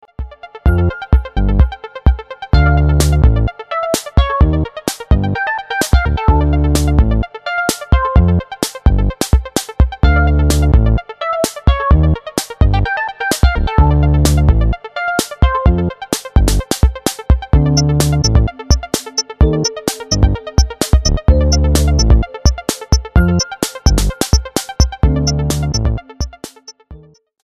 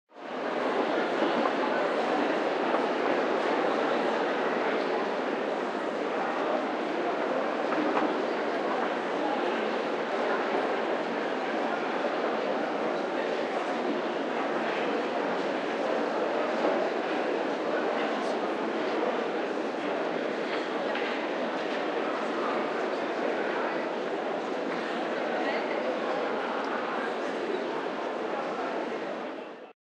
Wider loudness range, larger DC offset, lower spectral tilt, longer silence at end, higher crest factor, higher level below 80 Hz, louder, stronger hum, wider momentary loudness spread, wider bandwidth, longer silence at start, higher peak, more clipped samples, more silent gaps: about the same, 2 LU vs 3 LU; neither; about the same, -5 dB/octave vs -4.5 dB/octave; first, 0.5 s vs 0.1 s; about the same, 12 dB vs 16 dB; first, -16 dBFS vs -90 dBFS; first, -15 LUFS vs -30 LUFS; neither; first, 7 LU vs 4 LU; first, 14 kHz vs 10.5 kHz; about the same, 0.2 s vs 0.15 s; first, 0 dBFS vs -14 dBFS; neither; neither